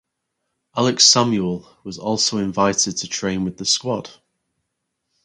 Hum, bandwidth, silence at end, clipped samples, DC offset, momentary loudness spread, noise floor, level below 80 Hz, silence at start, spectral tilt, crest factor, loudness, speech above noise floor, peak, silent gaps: none; 11.5 kHz; 1.15 s; under 0.1%; under 0.1%; 16 LU; -77 dBFS; -54 dBFS; 0.75 s; -3 dB/octave; 22 dB; -18 LUFS; 57 dB; 0 dBFS; none